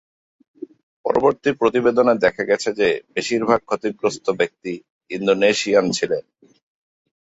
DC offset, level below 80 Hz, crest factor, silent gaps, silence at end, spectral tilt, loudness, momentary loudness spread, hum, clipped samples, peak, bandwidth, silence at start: under 0.1%; -58 dBFS; 18 dB; 4.90-5.01 s; 1.15 s; -4 dB/octave; -19 LUFS; 15 LU; none; under 0.1%; -2 dBFS; 8 kHz; 1.05 s